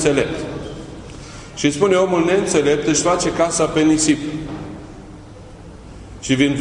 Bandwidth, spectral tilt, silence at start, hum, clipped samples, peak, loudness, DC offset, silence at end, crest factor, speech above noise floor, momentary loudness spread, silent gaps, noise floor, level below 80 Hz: 11 kHz; -4 dB/octave; 0 s; none; under 0.1%; -2 dBFS; -17 LUFS; under 0.1%; 0 s; 18 dB; 21 dB; 23 LU; none; -38 dBFS; -42 dBFS